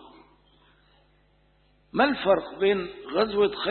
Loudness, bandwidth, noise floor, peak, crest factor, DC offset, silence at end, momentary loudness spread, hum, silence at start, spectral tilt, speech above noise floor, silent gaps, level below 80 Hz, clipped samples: -25 LUFS; 4.5 kHz; -63 dBFS; -8 dBFS; 20 dB; under 0.1%; 0 s; 7 LU; 50 Hz at -60 dBFS; 1.95 s; -9 dB/octave; 39 dB; none; -58 dBFS; under 0.1%